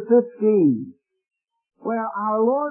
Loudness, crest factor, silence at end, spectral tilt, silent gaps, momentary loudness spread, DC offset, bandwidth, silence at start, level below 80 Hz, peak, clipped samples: -21 LUFS; 16 dB; 0 s; -15 dB/octave; none; 12 LU; under 0.1%; 2.7 kHz; 0 s; -78 dBFS; -6 dBFS; under 0.1%